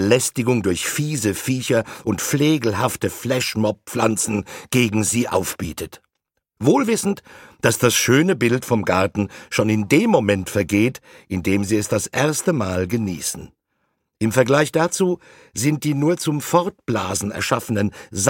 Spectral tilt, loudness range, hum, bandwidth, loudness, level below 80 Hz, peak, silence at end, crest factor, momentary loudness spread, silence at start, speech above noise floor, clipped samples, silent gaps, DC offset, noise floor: -4.5 dB/octave; 3 LU; none; 17 kHz; -20 LUFS; -52 dBFS; -2 dBFS; 0 s; 18 dB; 9 LU; 0 s; 57 dB; under 0.1%; none; under 0.1%; -77 dBFS